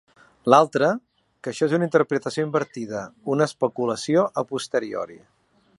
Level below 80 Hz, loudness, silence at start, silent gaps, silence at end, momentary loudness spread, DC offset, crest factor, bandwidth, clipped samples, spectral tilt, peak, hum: -70 dBFS; -23 LUFS; 0.45 s; none; 0.6 s; 14 LU; under 0.1%; 22 dB; 11.5 kHz; under 0.1%; -5.5 dB/octave; 0 dBFS; none